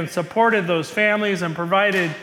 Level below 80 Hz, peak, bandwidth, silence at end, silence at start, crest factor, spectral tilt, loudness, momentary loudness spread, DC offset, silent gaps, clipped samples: -66 dBFS; -6 dBFS; 17.5 kHz; 0 s; 0 s; 14 dB; -5 dB/octave; -19 LUFS; 5 LU; under 0.1%; none; under 0.1%